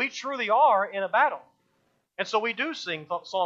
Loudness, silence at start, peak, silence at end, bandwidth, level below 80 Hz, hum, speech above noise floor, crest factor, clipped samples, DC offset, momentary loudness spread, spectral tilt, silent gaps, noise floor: -25 LUFS; 0 s; -10 dBFS; 0 s; 7.6 kHz; -84 dBFS; none; 45 dB; 16 dB; under 0.1%; under 0.1%; 12 LU; -3 dB/octave; none; -71 dBFS